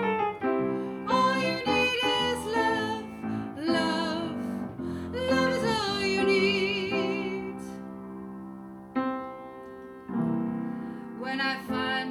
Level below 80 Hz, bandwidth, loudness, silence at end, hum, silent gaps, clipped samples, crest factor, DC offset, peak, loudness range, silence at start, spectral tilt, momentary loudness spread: -58 dBFS; 15.5 kHz; -28 LUFS; 0 s; none; none; under 0.1%; 18 dB; under 0.1%; -12 dBFS; 8 LU; 0 s; -5 dB/octave; 16 LU